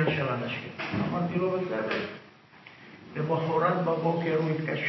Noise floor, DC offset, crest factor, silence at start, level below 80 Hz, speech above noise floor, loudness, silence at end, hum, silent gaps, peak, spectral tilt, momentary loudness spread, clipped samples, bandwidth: -52 dBFS; under 0.1%; 18 dB; 0 s; -62 dBFS; 24 dB; -29 LUFS; 0 s; none; none; -12 dBFS; -8 dB/octave; 14 LU; under 0.1%; 6 kHz